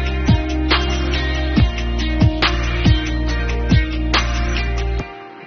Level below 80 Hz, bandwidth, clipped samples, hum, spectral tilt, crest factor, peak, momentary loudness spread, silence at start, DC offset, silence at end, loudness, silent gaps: -20 dBFS; 6.8 kHz; under 0.1%; none; -4.5 dB/octave; 14 dB; -2 dBFS; 5 LU; 0 s; under 0.1%; 0 s; -18 LUFS; none